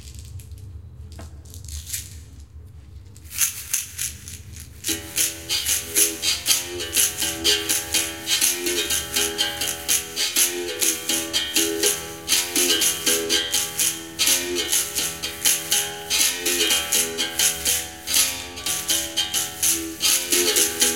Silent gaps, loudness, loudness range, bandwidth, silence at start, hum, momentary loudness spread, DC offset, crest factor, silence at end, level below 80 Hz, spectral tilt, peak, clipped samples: none; -20 LUFS; 9 LU; 17 kHz; 0 s; none; 18 LU; 0.2%; 24 dB; 0 s; -48 dBFS; 0 dB/octave; 0 dBFS; under 0.1%